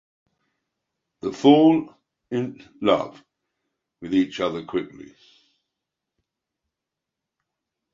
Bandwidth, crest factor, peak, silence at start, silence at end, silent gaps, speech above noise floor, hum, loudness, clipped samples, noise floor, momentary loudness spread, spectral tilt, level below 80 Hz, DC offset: 7.6 kHz; 24 dB; -2 dBFS; 1.25 s; 2.9 s; none; 64 dB; none; -22 LUFS; under 0.1%; -85 dBFS; 19 LU; -6.5 dB/octave; -64 dBFS; under 0.1%